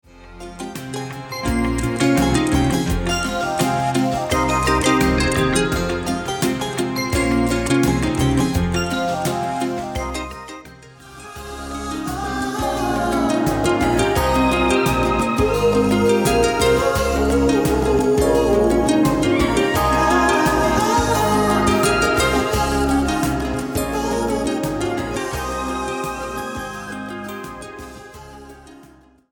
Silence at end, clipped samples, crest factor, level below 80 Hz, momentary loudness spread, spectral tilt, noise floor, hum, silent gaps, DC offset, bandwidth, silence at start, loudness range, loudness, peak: 0.5 s; under 0.1%; 16 dB; -32 dBFS; 13 LU; -5 dB/octave; -48 dBFS; none; none; under 0.1%; over 20 kHz; 0.15 s; 9 LU; -19 LUFS; -4 dBFS